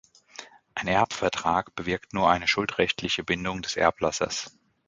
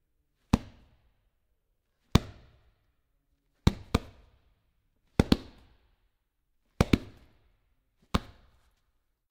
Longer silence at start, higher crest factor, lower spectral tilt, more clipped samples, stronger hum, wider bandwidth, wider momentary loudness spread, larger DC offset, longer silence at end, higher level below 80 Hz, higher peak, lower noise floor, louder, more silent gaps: second, 0.4 s vs 0.55 s; second, 22 dB vs 30 dB; second, -3.5 dB/octave vs -6 dB/octave; neither; neither; second, 9.6 kHz vs 16 kHz; first, 16 LU vs 7 LU; neither; second, 0.4 s vs 1.1 s; second, -52 dBFS vs -42 dBFS; about the same, -4 dBFS vs -4 dBFS; second, -47 dBFS vs -76 dBFS; first, -26 LUFS vs -30 LUFS; neither